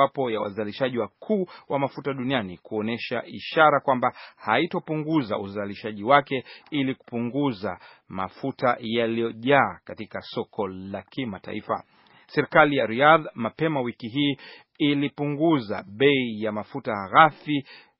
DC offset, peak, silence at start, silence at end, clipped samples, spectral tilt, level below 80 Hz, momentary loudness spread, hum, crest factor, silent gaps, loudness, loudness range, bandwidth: under 0.1%; -2 dBFS; 0 s; 0.2 s; under 0.1%; -3.5 dB/octave; -68 dBFS; 14 LU; none; 22 dB; none; -25 LUFS; 5 LU; 5.8 kHz